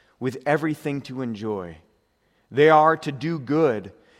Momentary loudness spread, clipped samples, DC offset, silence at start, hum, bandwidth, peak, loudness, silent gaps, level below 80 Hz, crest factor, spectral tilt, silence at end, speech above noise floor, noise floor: 15 LU; under 0.1%; under 0.1%; 0.2 s; none; 13.5 kHz; -4 dBFS; -22 LUFS; none; -66 dBFS; 20 dB; -7 dB/octave; 0.3 s; 44 dB; -66 dBFS